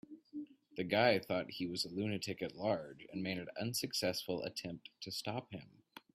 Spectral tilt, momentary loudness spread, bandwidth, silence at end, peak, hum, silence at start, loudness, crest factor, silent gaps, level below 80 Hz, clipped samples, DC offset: -4 dB/octave; 18 LU; 15.5 kHz; 0.15 s; -16 dBFS; none; 0.1 s; -39 LUFS; 22 dB; none; -76 dBFS; under 0.1%; under 0.1%